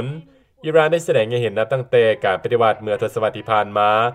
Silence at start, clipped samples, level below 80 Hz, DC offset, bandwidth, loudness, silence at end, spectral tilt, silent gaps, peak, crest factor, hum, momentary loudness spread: 0 s; under 0.1%; -60 dBFS; under 0.1%; 13.5 kHz; -18 LUFS; 0 s; -5.5 dB/octave; none; -2 dBFS; 16 dB; none; 7 LU